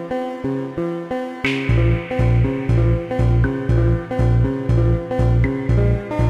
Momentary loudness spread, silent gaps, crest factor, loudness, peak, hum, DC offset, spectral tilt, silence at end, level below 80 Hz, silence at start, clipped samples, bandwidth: 7 LU; none; 12 dB; -19 LUFS; -6 dBFS; none; 0.3%; -8.5 dB/octave; 0 s; -24 dBFS; 0 s; under 0.1%; 6.4 kHz